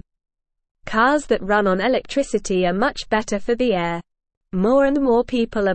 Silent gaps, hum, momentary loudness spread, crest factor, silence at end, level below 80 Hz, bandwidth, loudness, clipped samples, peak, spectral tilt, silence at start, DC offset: 4.37-4.41 s; none; 7 LU; 16 dB; 0 s; -42 dBFS; 8.8 kHz; -20 LUFS; under 0.1%; -4 dBFS; -5.5 dB/octave; 0.85 s; 0.4%